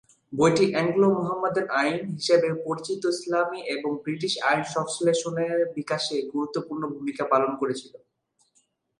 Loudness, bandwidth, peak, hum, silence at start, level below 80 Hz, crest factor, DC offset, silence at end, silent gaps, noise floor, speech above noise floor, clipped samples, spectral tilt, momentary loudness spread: -25 LUFS; 11.5 kHz; -6 dBFS; none; 0.3 s; -70 dBFS; 18 dB; under 0.1%; 1.05 s; none; -69 dBFS; 44 dB; under 0.1%; -4.5 dB/octave; 8 LU